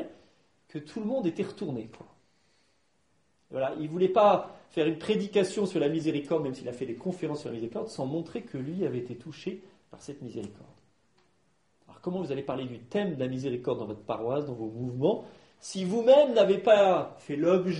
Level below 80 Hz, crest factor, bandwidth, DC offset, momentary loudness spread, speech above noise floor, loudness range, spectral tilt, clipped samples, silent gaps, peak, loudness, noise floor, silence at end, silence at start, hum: -68 dBFS; 20 dB; 11 kHz; under 0.1%; 18 LU; 44 dB; 13 LU; -6.5 dB/octave; under 0.1%; none; -10 dBFS; -29 LUFS; -72 dBFS; 0 s; 0 s; none